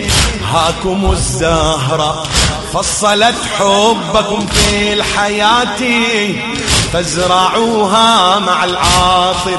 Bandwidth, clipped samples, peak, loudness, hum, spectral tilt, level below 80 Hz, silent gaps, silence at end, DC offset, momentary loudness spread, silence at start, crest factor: 12 kHz; under 0.1%; 0 dBFS; -11 LUFS; none; -3 dB/octave; -26 dBFS; none; 0 s; under 0.1%; 5 LU; 0 s; 12 dB